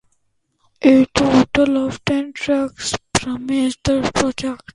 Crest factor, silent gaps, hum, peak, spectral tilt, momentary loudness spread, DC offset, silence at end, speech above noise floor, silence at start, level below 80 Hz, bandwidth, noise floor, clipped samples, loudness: 18 dB; none; none; 0 dBFS; -4.5 dB/octave; 8 LU; under 0.1%; 0.2 s; 49 dB; 0.8 s; -42 dBFS; 11.5 kHz; -66 dBFS; under 0.1%; -18 LUFS